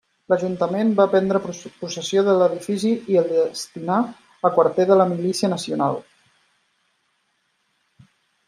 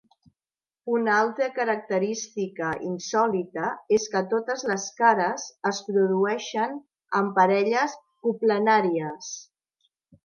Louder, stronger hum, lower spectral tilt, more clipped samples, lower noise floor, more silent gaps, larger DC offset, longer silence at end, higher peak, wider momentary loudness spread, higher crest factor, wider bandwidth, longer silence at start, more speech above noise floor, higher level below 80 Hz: first, -20 LUFS vs -25 LUFS; neither; about the same, -5.5 dB/octave vs -4.5 dB/octave; neither; second, -69 dBFS vs under -90 dBFS; neither; neither; first, 2.45 s vs 0.85 s; about the same, -4 dBFS vs -6 dBFS; about the same, 12 LU vs 10 LU; about the same, 18 dB vs 20 dB; first, 13 kHz vs 7.2 kHz; second, 0.3 s vs 0.85 s; second, 49 dB vs over 66 dB; about the same, -68 dBFS vs -72 dBFS